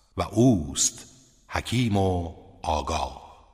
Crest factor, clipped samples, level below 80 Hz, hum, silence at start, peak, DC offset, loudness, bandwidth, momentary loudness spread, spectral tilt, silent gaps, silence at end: 18 dB; under 0.1%; -42 dBFS; none; 0.15 s; -8 dBFS; under 0.1%; -25 LUFS; 15.5 kHz; 14 LU; -4.5 dB/octave; none; 0.2 s